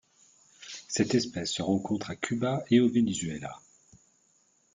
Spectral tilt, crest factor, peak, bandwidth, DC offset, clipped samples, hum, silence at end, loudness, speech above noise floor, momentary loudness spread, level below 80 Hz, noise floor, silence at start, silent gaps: -5 dB/octave; 20 dB; -10 dBFS; 9.4 kHz; under 0.1%; under 0.1%; none; 1.15 s; -29 LUFS; 40 dB; 19 LU; -64 dBFS; -68 dBFS; 0.6 s; none